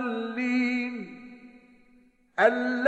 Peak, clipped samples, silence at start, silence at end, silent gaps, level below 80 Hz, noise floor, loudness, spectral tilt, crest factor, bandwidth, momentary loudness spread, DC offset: -8 dBFS; under 0.1%; 0 s; 0 s; none; -72 dBFS; -60 dBFS; -26 LUFS; -5.5 dB/octave; 20 dB; 8.2 kHz; 21 LU; under 0.1%